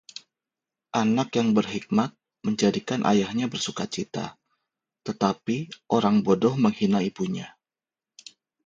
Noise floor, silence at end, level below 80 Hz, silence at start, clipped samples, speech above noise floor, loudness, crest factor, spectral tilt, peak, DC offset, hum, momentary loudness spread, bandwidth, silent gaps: under -90 dBFS; 1.15 s; -64 dBFS; 0.95 s; under 0.1%; over 66 dB; -25 LUFS; 20 dB; -5.5 dB/octave; -6 dBFS; under 0.1%; none; 13 LU; 7.6 kHz; none